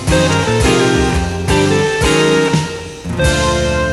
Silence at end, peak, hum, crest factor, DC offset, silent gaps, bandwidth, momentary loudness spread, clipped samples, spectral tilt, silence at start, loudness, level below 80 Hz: 0 s; -2 dBFS; none; 12 dB; under 0.1%; none; 15 kHz; 6 LU; under 0.1%; -4.5 dB/octave; 0 s; -13 LUFS; -24 dBFS